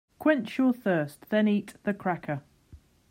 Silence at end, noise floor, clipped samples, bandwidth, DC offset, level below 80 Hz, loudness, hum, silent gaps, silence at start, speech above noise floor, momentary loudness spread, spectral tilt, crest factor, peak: 0.35 s; -55 dBFS; under 0.1%; 16 kHz; under 0.1%; -66 dBFS; -28 LUFS; none; none; 0.2 s; 28 dB; 8 LU; -7.5 dB/octave; 20 dB; -10 dBFS